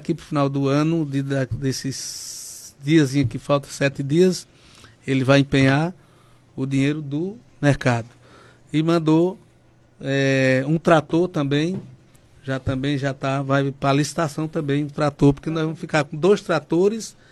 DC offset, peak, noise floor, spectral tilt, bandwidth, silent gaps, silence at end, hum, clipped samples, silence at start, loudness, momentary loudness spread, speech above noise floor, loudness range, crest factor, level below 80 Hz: under 0.1%; -2 dBFS; -54 dBFS; -6 dB/octave; 12.5 kHz; none; 0.2 s; none; under 0.1%; 0 s; -21 LUFS; 12 LU; 34 dB; 3 LU; 18 dB; -48 dBFS